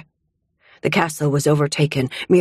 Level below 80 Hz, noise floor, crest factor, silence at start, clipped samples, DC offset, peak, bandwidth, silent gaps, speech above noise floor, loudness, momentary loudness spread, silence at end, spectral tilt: -54 dBFS; -71 dBFS; 18 dB; 0.85 s; under 0.1%; under 0.1%; -2 dBFS; 15 kHz; none; 53 dB; -19 LUFS; 5 LU; 0 s; -5.5 dB/octave